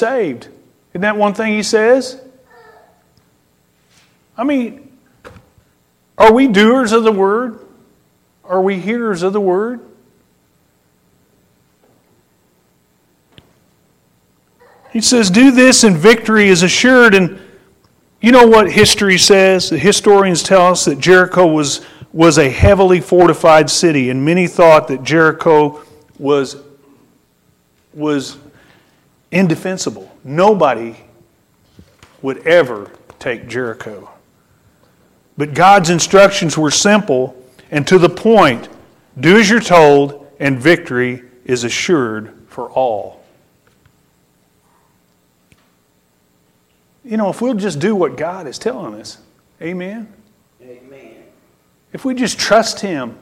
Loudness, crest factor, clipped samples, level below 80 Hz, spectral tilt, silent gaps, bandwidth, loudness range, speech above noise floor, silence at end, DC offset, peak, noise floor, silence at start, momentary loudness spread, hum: -11 LUFS; 14 dB; under 0.1%; -44 dBFS; -4 dB/octave; none; 16.5 kHz; 15 LU; 46 dB; 0.1 s; under 0.1%; 0 dBFS; -57 dBFS; 0 s; 17 LU; none